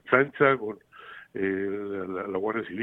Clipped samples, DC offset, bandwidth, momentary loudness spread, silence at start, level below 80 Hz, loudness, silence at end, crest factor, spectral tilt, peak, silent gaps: under 0.1%; under 0.1%; 4 kHz; 19 LU; 0.05 s; -70 dBFS; -27 LUFS; 0 s; 22 dB; -8.5 dB/octave; -6 dBFS; none